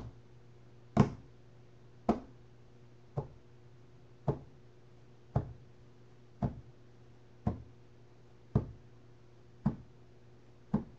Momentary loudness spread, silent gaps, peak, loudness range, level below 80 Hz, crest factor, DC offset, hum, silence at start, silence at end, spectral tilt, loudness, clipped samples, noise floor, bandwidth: 24 LU; none; -12 dBFS; 6 LU; -54 dBFS; 28 dB; 0.1%; none; 0 s; 0.05 s; -9 dB/octave; -38 LUFS; under 0.1%; -60 dBFS; 7.8 kHz